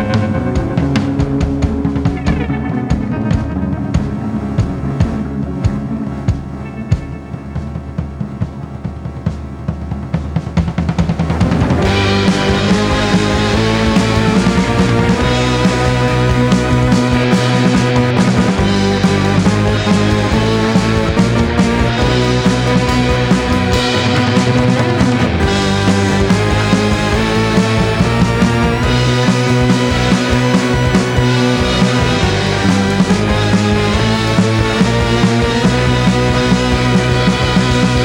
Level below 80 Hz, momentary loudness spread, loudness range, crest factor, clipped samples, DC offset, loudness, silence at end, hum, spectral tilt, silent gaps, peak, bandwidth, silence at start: -24 dBFS; 7 LU; 7 LU; 12 dB; under 0.1%; under 0.1%; -13 LUFS; 0 s; none; -6 dB/octave; none; 0 dBFS; 16 kHz; 0 s